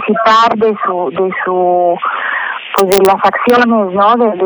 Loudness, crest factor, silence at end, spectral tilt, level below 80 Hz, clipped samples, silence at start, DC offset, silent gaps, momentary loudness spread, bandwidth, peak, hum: -11 LUFS; 10 dB; 0 s; -4.5 dB/octave; -52 dBFS; under 0.1%; 0 s; under 0.1%; none; 7 LU; over 20 kHz; 0 dBFS; none